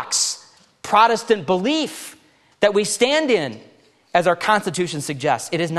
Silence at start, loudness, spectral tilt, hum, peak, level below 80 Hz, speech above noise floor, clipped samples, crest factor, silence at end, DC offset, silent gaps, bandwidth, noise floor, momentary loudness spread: 0 s; -19 LUFS; -3 dB/octave; none; -2 dBFS; -64 dBFS; 28 dB; under 0.1%; 18 dB; 0 s; under 0.1%; none; 13 kHz; -47 dBFS; 12 LU